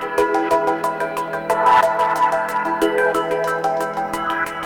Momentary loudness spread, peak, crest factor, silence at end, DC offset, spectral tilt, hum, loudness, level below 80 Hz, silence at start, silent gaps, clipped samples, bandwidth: 8 LU; -6 dBFS; 14 dB; 0 s; under 0.1%; -4 dB/octave; none; -19 LUFS; -54 dBFS; 0 s; none; under 0.1%; 19 kHz